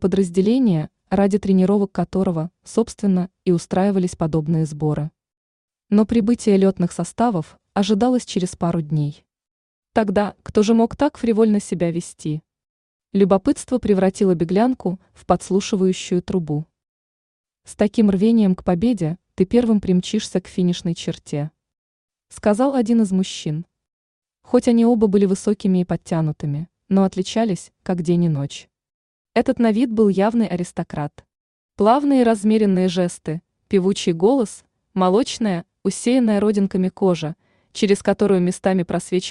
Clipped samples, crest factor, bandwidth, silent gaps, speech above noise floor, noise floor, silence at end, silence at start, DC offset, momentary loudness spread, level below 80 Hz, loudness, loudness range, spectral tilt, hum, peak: under 0.1%; 16 dB; 11 kHz; 5.37-5.68 s, 9.51-9.83 s, 12.69-13.00 s, 16.89-17.44 s, 21.78-22.08 s, 23.93-24.22 s, 28.94-29.25 s, 31.40-31.69 s; over 72 dB; under -90 dBFS; 0 s; 0 s; under 0.1%; 10 LU; -50 dBFS; -19 LUFS; 3 LU; -7 dB/octave; none; -4 dBFS